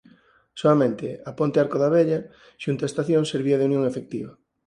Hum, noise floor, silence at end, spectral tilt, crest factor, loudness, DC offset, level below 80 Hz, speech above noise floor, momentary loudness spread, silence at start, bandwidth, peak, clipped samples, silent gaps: none; -56 dBFS; 0.35 s; -7 dB/octave; 18 dB; -23 LUFS; under 0.1%; -64 dBFS; 34 dB; 14 LU; 0.55 s; 11 kHz; -6 dBFS; under 0.1%; none